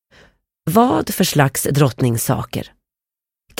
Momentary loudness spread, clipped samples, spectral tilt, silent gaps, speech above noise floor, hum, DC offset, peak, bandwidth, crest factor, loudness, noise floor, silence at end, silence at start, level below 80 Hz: 14 LU; under 0.1%; -5 dB/octave; none; 72 dB; none; under 0.1%; -2 dBFS; 17 kHz; 18 dB; -17 LUFS; -88 dBFS; 0.9 s; 0.65 s; -48 dBFS